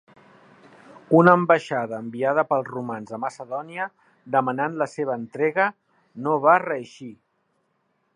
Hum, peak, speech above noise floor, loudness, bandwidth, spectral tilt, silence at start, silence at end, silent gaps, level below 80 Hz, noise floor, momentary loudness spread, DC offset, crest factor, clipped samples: none; 0 dBFS; 48 dB; -23 LUFS; 10.5 kHz; -7.5 dB/octave; 1.1 s; 1 s; none; -74 dBFS; -70 dBFS; 15 LU; under 0.1%; 24 dB; under 0.1%